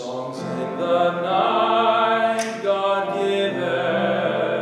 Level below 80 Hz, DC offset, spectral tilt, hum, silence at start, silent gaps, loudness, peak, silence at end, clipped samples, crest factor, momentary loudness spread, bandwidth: -70 dBFS; under 0.1%; -5 dB/octave; none; 0 s; none; -21 LUFS; -6 dBFS; 0 s; under 0.1%; 14 dB; 9 LU; 12.5 kHz